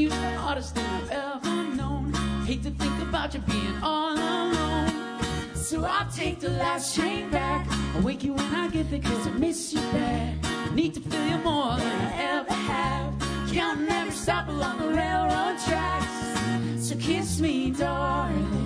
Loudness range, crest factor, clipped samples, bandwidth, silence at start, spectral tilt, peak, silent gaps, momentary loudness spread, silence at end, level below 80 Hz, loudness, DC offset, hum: 1 LU; 16 dB; under 0.1%; 11 kHz; 0 s; -5 dB/octave; -10 dBFS; none; 4 LU; 0 s; -38 dBFS; -27 LUFS; under 0.1%; none